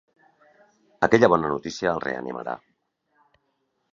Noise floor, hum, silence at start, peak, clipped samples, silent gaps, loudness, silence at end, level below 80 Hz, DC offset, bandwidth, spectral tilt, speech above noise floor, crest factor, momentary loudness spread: -73 dBFS; none; 1 s; -2 dBFS; under 0.1%; none; -23 LUFS; 1.35 s; -58 dBFS; under 0.1%; 7.6 kHz; -6 dB/octave; 51 dB; 24 dB; 16 LU